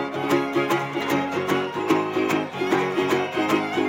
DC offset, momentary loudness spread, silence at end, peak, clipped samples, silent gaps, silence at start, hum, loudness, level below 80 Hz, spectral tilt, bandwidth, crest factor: under 0.1%; 2 LU; 0 s; -6 dBFS; under 0.1%; none; 0 s; none; -23 LUFS; -66 dBFS; -5 dB/octave; 17 kHz; 16 dB